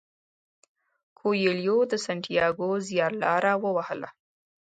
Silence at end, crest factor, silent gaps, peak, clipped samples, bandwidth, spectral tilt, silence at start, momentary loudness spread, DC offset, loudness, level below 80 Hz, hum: 0.55 s; 18 dB; none; -10 dBFS; under 0.1%; 9.2 kHz; -5 dB/octave; 1.25 s; 8 LU; under 0.1%; -26 LUFS; -68 dBFS; none